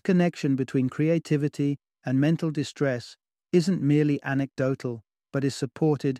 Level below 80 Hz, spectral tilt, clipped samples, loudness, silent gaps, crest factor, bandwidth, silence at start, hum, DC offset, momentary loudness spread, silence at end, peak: -68 dBFS; -7.5 dB/octave; under 0.1%; -26 LUFS; none; 16 dB; 12 kHz; 0.05 s; none; under 0.1%; 10 LU; 0 s; -10 dBFS